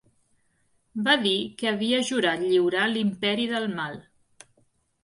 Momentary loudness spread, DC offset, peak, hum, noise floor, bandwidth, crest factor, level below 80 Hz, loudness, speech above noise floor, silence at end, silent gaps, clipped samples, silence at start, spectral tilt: 10 LU; under 0.1%; -6 dBFS; none; -68 dBFS; 11.5 kHz; 20 dB; -68 dBFS; -24 LUFS; 43 dB; 1.05 s; none; under 0.1%; 0.95 s; -4 dB/octave